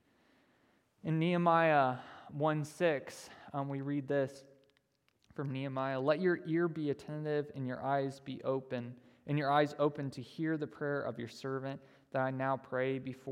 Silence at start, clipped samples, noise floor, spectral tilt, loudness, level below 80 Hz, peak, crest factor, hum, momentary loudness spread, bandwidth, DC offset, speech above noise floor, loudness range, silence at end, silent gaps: 1.05 s; under 0.1%; -76 dBFS; -7 dB/octave; -35 LUFS; -80 dBFS; -16 dBFS; 20 dB; none; 13 LU; 13.5 kHz; under 0.1%; 42 dB; 5 LU; 0 s; none